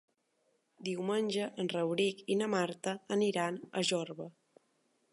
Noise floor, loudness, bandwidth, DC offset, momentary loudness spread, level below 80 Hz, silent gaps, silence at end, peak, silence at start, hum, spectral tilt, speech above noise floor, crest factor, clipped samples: -77 dBFS; -34 LUFS; 11.5 kHz; under 0.1%; 9 LU; -84 dBFS; none; 0.8 s; -20 dBFS; 0.8 s; none; -4.5 dB/octave; 43 dB; 16 dB; under 0.1%